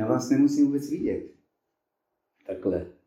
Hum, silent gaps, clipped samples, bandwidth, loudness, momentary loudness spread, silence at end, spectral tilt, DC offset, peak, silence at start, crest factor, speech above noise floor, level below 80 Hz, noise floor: none; none; under 0.1%; 13 kHz; -25 LUFS; 15 LU; 0.15 s; -7 dB/octave; under 0.1%; -10 dBFS; 0 s; 18 dB; 56 dB; -60 dBFS; -81 dBFS